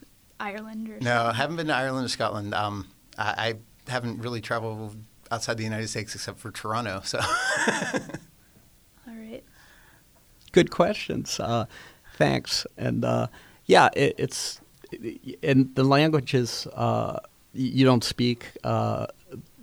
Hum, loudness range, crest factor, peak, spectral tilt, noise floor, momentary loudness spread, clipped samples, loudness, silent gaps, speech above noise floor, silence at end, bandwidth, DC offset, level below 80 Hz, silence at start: none; 7 LU; 24 dB; -4 dBFS; -5 dB/octave; -57 dBFS; 18 LU; under 0.1%; -26 LUFS; none; 32 dB; 0.2 s; over 20 kHz; under 0.1%; -56 dBFS; 0.4 s